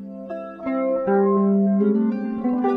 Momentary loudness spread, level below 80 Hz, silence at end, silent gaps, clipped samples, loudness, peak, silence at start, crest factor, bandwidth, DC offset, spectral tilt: 14 LU; -62 dBFS; 0 s; none; under 0.1%; -21 LUFS; -8 dBFS; 0 s; 12 dB; 3.9 kHz; under 0.1%; -11.5 dB/octave